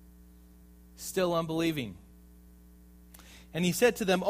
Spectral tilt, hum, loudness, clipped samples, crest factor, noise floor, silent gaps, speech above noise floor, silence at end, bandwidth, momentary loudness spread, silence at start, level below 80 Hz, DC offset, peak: -4.5 dB/octave; none; -30 LUFS; under 0.1%; 20 dB; -55 dBFS; none; 26 dB; 0 s; 15.5 kHz; 25 LU; 1 s; -56 dBFS; under 0.1%; -12 dBFS